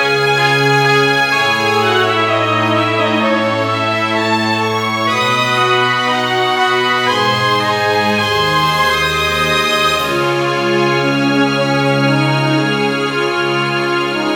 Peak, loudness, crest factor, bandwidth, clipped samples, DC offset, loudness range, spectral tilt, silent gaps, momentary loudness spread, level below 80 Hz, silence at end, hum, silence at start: -2 dBFS; -13 LUFS; 12 dB; 19.5 kHz; under 0.1%; under 0.1%; 2 LU; -4.5 dB/octave; none; 3 LU; -44 dBFS; 0 s; none; 0 s